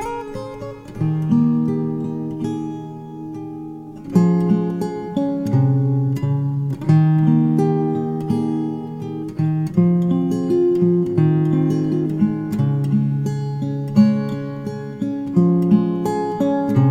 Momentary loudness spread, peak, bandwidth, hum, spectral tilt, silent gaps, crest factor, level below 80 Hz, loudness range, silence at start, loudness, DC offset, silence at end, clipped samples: 13 LU; -2 dBFS; 9.8 kHz; none; -9.5 dB/octave; none; 16 dB; -50 dBFS; 4 LU; 0 s; -19 LUFS; under 0.1%; 0 s; under 0.1%